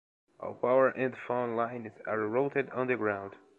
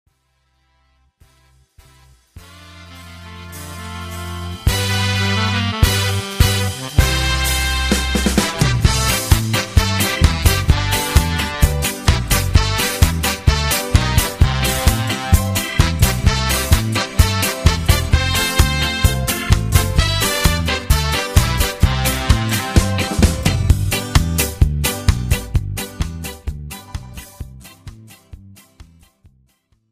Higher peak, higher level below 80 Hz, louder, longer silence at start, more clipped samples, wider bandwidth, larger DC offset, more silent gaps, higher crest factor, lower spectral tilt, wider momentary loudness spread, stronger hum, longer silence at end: second, -12 dBFS vs 0 dBFS; second, -74 dBFS vs -22 dBFS; second, -31 LUFS vs -17 LUFS; second, 0.4 s vs 2.35 s; neither; second, 4.2 kHz vs 15.5 kHz; neither; neither; about the same, 18 dB vs 18 dB; first, -8.5 dB/octave vs -4 dB/octave; about the same, 12 LU vs 13 LU; neither; second, 0.2 s vs 1.1 s